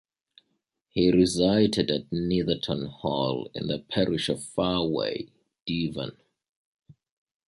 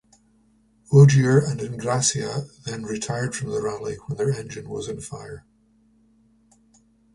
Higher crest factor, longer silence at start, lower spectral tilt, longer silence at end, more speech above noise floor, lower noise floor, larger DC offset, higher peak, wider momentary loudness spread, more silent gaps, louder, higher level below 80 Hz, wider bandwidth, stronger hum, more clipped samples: about the same, 18 dB vs 20 dB; about the same, 0.95 s vs 0.9 s; about the same, -5.5 dB/octave vs -5.5 dB/octave; second, 0.55 s vs 1.75 s; first, 51 dB vs 39 dB; first, -77 dBFS vs -61 dBFS; neither; second, -8 dBFS vs -4 dBFS; second, 12 LU vs 19 LU; first, 5.62-5.66 s, 6.49-6.79 s vs none; second, -26 LUFS vs -22 LUFS; about the same, -52 dBFS vs -54 dBFS; about the same, 11.5 kHz vs 11.5 kHz; neither; neither